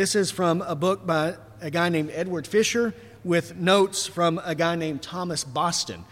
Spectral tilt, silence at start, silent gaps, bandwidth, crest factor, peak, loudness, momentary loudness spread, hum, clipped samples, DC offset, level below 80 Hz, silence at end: -4 dB/octave; 0 s; none; 16 kHz; 16 dB; -8 dBFS; -24 LUFS; 8 LU; none; under 0.1%; under 0.1%; -60 dBFS; 0.05 s